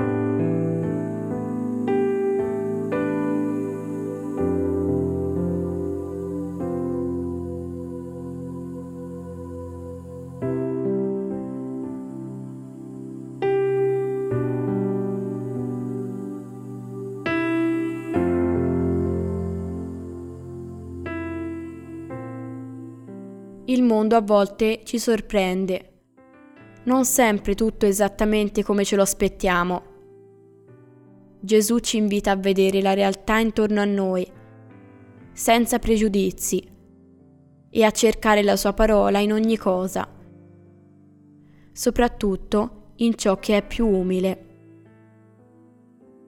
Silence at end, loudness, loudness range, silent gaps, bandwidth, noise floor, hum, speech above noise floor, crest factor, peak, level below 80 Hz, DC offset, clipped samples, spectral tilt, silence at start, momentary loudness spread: 1.85 s; -23 LUFS; 9 LU; none; 17 kHz; -53 dBFS; none; 33 dB; 20 dB; -4 dBFS; -42 dBFS; under 0.1%; under 0.1%; -5 dB/octave; 0 s; 16 LU